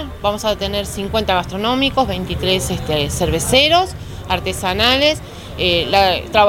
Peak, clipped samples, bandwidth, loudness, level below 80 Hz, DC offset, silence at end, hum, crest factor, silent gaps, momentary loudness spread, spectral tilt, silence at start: 0 dBFS; under 0.1%; over 20 kHz; -16 LUFS; -34 dBFS; under 0.1%; 0 s; none; 16 dB; none; 9 LU; -3.5 dB/octave; 0 s